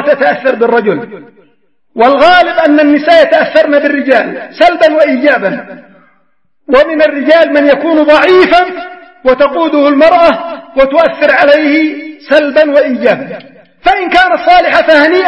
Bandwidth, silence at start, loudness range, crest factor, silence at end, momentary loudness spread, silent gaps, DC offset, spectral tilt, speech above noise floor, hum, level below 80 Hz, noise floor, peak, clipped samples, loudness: 9.2 kHz; 0 s; 2 LU; 8 dB; 0 s; 11 LU; none; 0.3%; -5.5 dB/octave; 52 dB; none; -42 dBFS; -60 dBFS; 0 dBFS; 1%; -8 LUFS